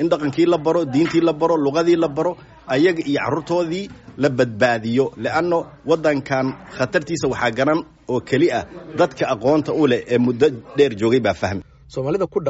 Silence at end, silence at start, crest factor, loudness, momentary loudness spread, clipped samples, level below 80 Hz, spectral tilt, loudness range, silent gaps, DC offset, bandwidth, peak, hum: 0 s; 0 s; 16 dB; -19 LUFS; 8 LU; under 0.1%; -52 dBFS; -5 dB/octave; 2 LU; none; under 0.1%; 8 kHz; -4 dBFS; none